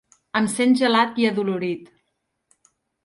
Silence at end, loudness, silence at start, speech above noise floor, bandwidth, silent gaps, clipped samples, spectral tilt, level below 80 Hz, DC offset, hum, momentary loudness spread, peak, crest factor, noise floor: 1.2 s; -21 LUFS; 0.35 s; 55 dB; 11.5 kHz; none; under 0.1%; -4.5 dB/octave; -68 dBFS; under 0.1%; none; 10 LU; -6 dBFS; 16 dB; -75 dBFS